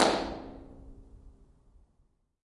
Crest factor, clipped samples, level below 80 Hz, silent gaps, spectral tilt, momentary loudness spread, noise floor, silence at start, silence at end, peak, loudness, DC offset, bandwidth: 28 dB; under 0.1%; -54 dBFS; none; -3 dB/octave; 26 LU; -70 dBFS; 0 s; 1.15 s; -8 dBFS; -33 LUFS; under 0.1%; 11.5 kHz